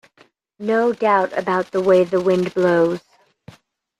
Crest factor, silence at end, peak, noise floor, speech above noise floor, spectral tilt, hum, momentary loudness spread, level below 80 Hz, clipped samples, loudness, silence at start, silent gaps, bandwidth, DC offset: 16 dB; 1 s; -2 dBFS; -56 dBFS; 38 dB; -7 dB/octave; none; 6 LU; -64 dBFS; under 0.1%; -18 LUFS; 0.6 s; none; 11 kHz; under 0.1%